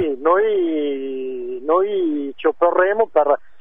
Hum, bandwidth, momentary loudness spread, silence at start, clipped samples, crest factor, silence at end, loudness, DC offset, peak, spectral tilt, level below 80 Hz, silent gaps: none; 3.7 kHz; 10 LU; 0 s; under 0.1%; 16 dB; 0.25 s; -19 LUFS; 1%; -2 dBFS; -8 dB/octave; -66 dBFS; none